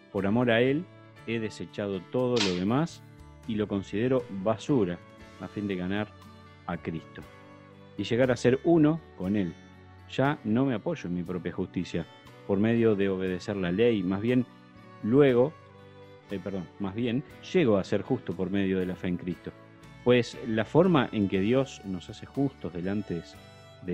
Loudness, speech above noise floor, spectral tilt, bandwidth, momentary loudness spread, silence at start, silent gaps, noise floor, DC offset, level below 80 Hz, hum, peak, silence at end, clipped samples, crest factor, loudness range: -28 LUFS; 23 dB; -7 dB/octave; 10 kHz; 15 LU; 0.15 s; none; -50 dBFS; under 0.1%; -60 dBFS; none; -8 dBFS; 0 s; under 0.1%; 20 dB; 4 LU